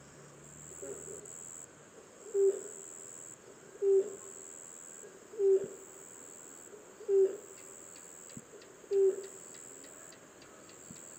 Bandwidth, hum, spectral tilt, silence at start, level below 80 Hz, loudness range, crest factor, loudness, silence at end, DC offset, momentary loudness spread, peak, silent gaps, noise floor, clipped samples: 16.5 kHz; none; -4 dB/octave; 0.45 s; -78 dBFS; 4 LU; 16 dB; -34 LUFS; 0 s; under 0.1%; 22 LU; -20 dBFS; none; -56 dBFS; under 0.1%